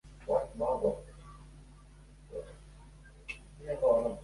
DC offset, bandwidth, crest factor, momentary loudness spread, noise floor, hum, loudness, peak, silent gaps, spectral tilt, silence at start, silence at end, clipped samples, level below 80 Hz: under 0.1%; 11.5 kHz; 20 dB; 26 LU; -55 dBFS; none; -34 LUFS; -16 dBFS; none; -6.5 dB/octave; 0.05 s; 0 s; under 0.1%; -54 dBFS